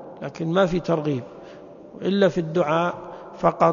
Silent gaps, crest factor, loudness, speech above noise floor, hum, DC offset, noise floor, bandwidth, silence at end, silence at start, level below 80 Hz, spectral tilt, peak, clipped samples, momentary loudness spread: none; 20 dB; -23 LUFS; 21 dB; none; under 0.1%; -42 dBFS; 7.2 kHz; 0 s; 0 s; -52 dBFS; -7 dB/octave; -4 dBFS; under 0.1%; 21 LU